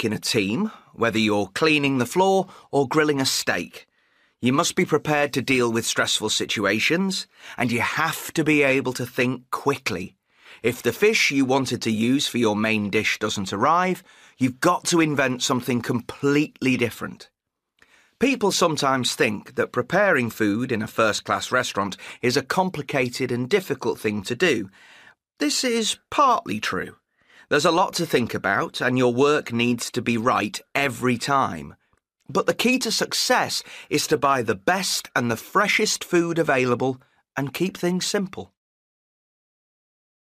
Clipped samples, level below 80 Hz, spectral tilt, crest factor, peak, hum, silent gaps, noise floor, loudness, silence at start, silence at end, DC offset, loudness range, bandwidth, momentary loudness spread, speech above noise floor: under 0.1%; -62 dBFS; -4 dB/octave; 16 dB; -6 dBFS; none; none; -74 dBFS; -22 LUFS; 0 s; 1.9 s; under 0.1%; 3 LU; 15.5 kHz; 8 LU; 51 dB